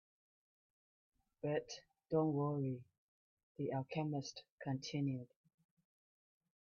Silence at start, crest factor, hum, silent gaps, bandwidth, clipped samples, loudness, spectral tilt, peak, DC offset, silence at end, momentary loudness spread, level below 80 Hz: 1.45 s; 20 dB; none; 2.98-3.37 s, 3.43-3.55 s, 4.52-4.58 s; 7 kHz; under 0.1%; -42 LUFS; -7 dB/octave; -24 dBFS; under 0.1%; 1.35 s; 14 LU; -80 dBFS